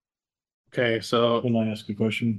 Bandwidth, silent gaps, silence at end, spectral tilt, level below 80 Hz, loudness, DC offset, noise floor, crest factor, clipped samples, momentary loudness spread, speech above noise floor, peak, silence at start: 12.5 kHz; none; 0 s; -6 dB/octave; -68 dBFS; -25 LUFS; under 0.1%; under -90 dBFS; 18 dB; under 0.1%; 6 LU; over 66 dB; -8 dBFS; 0.75 s